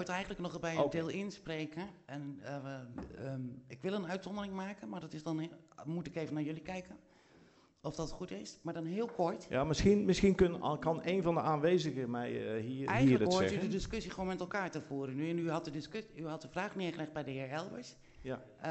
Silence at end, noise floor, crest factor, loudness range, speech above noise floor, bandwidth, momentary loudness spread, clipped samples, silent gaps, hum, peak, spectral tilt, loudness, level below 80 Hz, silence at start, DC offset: 0 s; -65 dBFS; 22 dB; 11 LU; 29 dB; 8.2 kHz; 16 LU; under 0.1%; none; none; -16 dBFS; -6 dB/octave; -37 LUFS; -56 dBFS; 0 s; under 0.1%